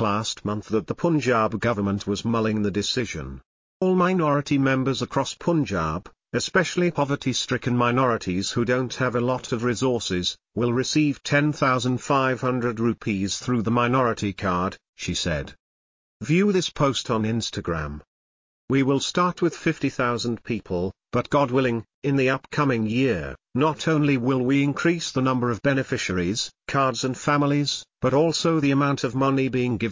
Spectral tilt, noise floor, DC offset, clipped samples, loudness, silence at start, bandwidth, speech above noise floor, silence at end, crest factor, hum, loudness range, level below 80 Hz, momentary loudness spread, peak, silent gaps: -5.5 dB/octave; under -90 dBFS; under 0.1%; under 0.1%; -23 LUFS; 0 s; 7.6 kHz; over 67 dB; 0 s; 16 dB; none; 2 LU; -48 dBFS; 6 LU; -8 dBFS; 3.46-3.80 s, 14.89-14.93 s, 15.59-16.20 s, 18.07-18.68 s, 21.94-22.02 s